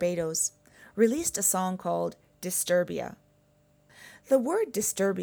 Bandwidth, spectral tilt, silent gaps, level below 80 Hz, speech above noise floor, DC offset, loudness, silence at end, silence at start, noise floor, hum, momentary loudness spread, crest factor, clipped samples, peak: over 20 kHz; -3.5 dB/octave; none; -66 dBFS; 37 dB; under 0.1%; -28 LUFS; 0 s; 0 s; -64 dBFS; none; 11 LU; 18 dB; under 0.1%; -12 dBFS